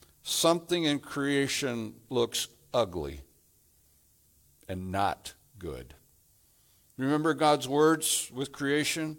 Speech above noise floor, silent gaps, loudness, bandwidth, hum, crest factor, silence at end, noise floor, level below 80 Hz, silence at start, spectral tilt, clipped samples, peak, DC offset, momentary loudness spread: 36 dB; none; -29 LUFS; 18.5 kHz; none; 20 dB; 0 s; -65 dBFS; -60 dBFS; 0.25 s; -3.5 dB/octave; under 0.1%; -10 dBFS; under 0.1%; 17 LU